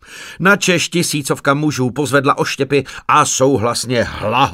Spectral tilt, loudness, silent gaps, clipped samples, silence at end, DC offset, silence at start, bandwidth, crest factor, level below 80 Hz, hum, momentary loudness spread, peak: -4 dB/octave; -15 LUFS; none; under 0.1%; 0 s; under 0.1%; 0.1 s; 16 kHz; 14 dB; -46 dBFS; none; 5 LU; 0 dBFS